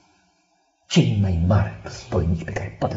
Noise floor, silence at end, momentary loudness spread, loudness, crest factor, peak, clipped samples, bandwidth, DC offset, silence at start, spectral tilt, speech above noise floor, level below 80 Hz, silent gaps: -65 dBFS; 0 s; 9 LU; -22 LUFS; 18 dB; -4 dBFS; under 0.1%; 8 kHz; under 0.1%; 0.9 s; -6.5 dB/octave; 44 dB; -38 dBFS; none